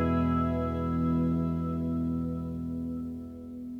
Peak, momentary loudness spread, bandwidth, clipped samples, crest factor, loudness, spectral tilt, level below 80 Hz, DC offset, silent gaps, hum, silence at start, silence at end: -16 dBFS; 11 LU; 4.4 kHz; under 0.1%; 12 dB; -30 LUFS; -10 dB/octave; -44 dBFS; under 0.1%; none; none; 0 s; 0 s